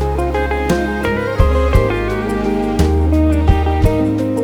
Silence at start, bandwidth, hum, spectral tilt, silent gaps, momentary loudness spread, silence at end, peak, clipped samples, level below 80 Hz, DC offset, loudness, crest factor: 0 s; 14.5 kHz; none; -7.5 dB/octave; none; 4 LU; 0 s; 0 dBFS; under 0.1%; -18 dBFS; under 0.1%; -16 LUFS; 14 dB